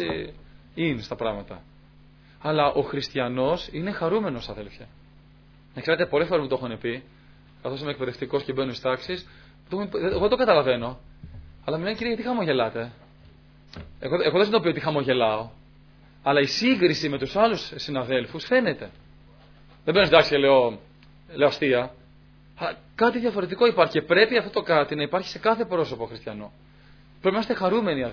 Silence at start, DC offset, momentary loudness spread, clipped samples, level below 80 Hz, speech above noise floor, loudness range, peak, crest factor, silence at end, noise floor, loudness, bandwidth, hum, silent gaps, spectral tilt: 0 s; under 0.1%; 17 LU; under 0.1%; -52 dBFS; 28 dB; 6 LU; -2 dBFS; 24 dB; 0 s; -52 dBFS; -24 LUFS; 5.4 kHz; none; none; -6 dB/octave